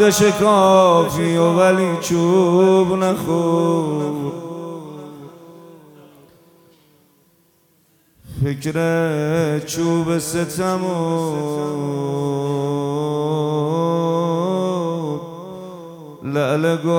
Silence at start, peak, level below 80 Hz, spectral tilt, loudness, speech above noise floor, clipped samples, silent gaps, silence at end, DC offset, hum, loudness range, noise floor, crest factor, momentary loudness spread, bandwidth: 0 s; -2 dBFS; -54 dBFS; -6 dB/octave; -18 LUFS; 42 dB; under 0.1%; none; 0 s; under 0.1%; none; 14 LU; -58 dBFS; 16 dB; 18 LU; 18.5 kHz